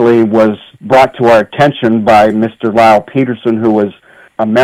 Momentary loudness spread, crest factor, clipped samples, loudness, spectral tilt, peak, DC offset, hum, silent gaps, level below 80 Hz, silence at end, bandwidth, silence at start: 7 LU; 10 dB; under 0.1%; -10 LUFS; -7 dB/octave; 0 dBFS; under 0.1%; none; none; -46 dBFS; 0 s; 13.5 kHz; 0 s